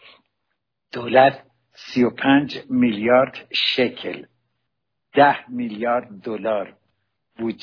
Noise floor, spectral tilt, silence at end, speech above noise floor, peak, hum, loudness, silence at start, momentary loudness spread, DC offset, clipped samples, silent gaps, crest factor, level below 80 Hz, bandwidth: -79 dBFS; -6.5 dB/octave; 0.1 s; 60 dB; -2 dBFS; none; -20 LUFS; 0.95 s; 16 LU; under 0.1%; under 0.1%; none; 20 dB; -62 dBFS; 5.4 kHz